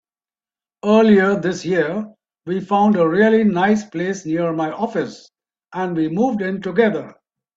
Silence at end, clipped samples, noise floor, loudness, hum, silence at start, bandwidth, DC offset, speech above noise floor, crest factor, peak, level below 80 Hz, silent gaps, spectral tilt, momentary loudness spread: 0.45 s; under 0.1%; under -90 dBFS; -18 LUFS; none; 0.85 s; 7.6 kHz; under 0.1%; over 73 dB; 16 dB; -2 dBFS; -60 dBFS; none; -6.5 dB/octave; 12 LU